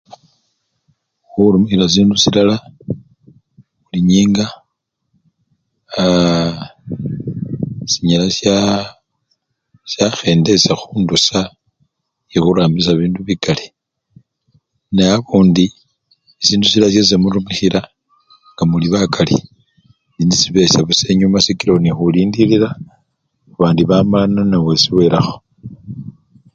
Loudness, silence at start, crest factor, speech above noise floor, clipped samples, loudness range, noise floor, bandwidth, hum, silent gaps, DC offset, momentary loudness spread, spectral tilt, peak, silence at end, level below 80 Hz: -13 LUFS; 1.35 s; 16 dB; 59 dB; under 0.1%; 5 LU; -72 dBFS; 7.8 kHz; none; none; under 0.1%; 15 LU; -5 dB/octave; 0 dBFS; 0.45 s; -42 dBFS